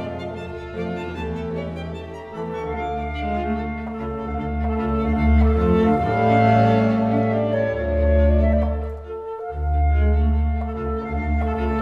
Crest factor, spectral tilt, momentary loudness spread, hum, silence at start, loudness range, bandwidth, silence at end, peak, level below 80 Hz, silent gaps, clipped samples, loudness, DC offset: 16 dB; -9.5 dB/octave; 13 LU; none; 0 s; 9 LU; 5.2 kHz; 0 s; -4 dBFS; -24 dBFS; none; under 0.1%; -22 LUFS; under 0.1%